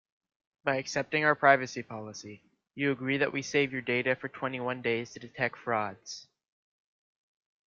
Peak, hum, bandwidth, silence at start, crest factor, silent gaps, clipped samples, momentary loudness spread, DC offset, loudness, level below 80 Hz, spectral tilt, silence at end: -6 dBFS; none; 7.6 kHz; 0.65 s; 26 dB; none; under 0.1%; 19 LU; under 0.1%; -30 LUFS; -72 dBFS; -4.5 dB/octave; 1.45 s